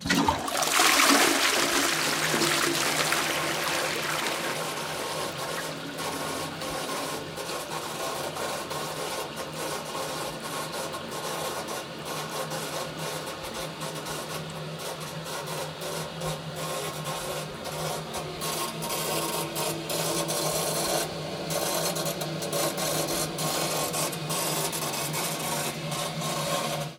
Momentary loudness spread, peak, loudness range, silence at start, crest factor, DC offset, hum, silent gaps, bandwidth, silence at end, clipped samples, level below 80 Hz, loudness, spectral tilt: 10 LU; -8 dBFS; 9 LU; 0 s; 22 dB; under 0.1%; none; none; 18 kHz; 0 s; under 0.1%; -60 dBFS; -28 LUFS; -2.5 dB/octave